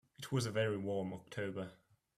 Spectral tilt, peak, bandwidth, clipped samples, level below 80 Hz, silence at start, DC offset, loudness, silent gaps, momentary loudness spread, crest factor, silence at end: -5.5 dB/octave; -24 dBFS; 14.5 kHz; under 0.1%; -72 dBFS; 0.2 s; under 0.1%; -40 LUFS; none; 9 LU; 16 dB; 0.45 s